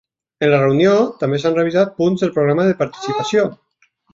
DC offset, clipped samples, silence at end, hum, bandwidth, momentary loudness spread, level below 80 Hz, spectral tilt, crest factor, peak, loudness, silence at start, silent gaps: under 0.1%; under 0.1%; 0.6 s; none; 7.8 kHz; 7 LU; -56 dBFS; -6.5 dB/octave; 16 dB; -2 dBFS; -16 LUFS; 0.4 s; none